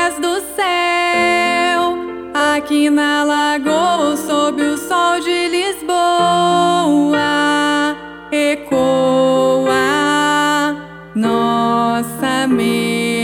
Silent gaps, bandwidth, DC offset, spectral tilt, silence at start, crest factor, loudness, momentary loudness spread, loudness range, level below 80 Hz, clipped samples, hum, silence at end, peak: none; 17.5 kHz; under 0.1%; -3.5 dB/octave; 0 s; 14 dB; -15 LUFS; 5 LU; 1 LU; -52 dBFS; under 0.1%; none; 0 s; -2 dBFS